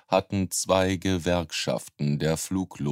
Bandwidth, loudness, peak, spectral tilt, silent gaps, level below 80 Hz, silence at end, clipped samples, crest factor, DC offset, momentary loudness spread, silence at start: 16 kHz; -26 LUFS; -6 dBFS; -4.5 dB/octave; none; -52 dBFS; 0 s; under 0.1%; 20 dB; under 0.1%; 6 LU; 0.1 s